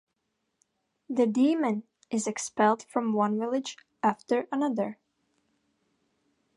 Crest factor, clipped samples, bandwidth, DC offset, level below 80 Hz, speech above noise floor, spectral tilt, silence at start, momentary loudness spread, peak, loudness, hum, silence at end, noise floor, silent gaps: 20 dB; under 0.1%; 11.5 kHz; under 0.1%; -82 dBFS; 53 dB; -5 dB/octave; 1.1 s; 9 LU; -10 dBFS; -28 LUFS; none; 1.65 s; -80 dBFS; none